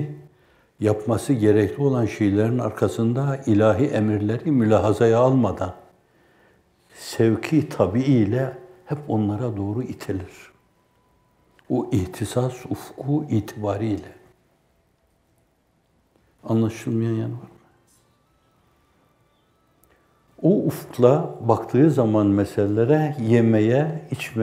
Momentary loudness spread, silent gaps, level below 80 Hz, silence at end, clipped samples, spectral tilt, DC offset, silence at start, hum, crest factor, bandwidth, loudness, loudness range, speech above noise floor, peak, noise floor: 13 LU; none; -60 dBFS; 0 s; under 0.1%; -8 dB/octave; under 0.1%; 0 s; none; 20 dB; 16 kHz; -22 LUFS; 10 LU; 45 dB; -2 dBFS; -65 dBFS